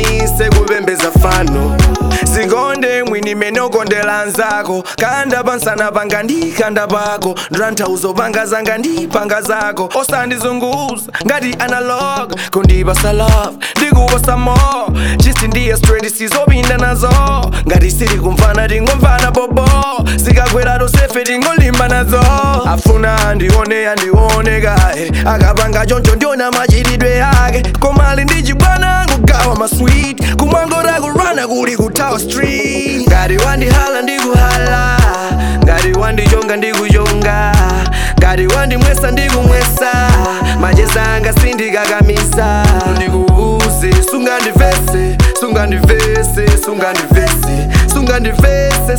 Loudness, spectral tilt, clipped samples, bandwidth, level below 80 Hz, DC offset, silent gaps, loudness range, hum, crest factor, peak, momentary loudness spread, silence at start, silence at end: -11 LUFS; -5 dB/octave; under 0.1%; 19.5 kHz; -14 dBFS; 0.7%; none; 4 LU; none; 10 dB; 0 dBFS; 5 LU; 0 s; 0 s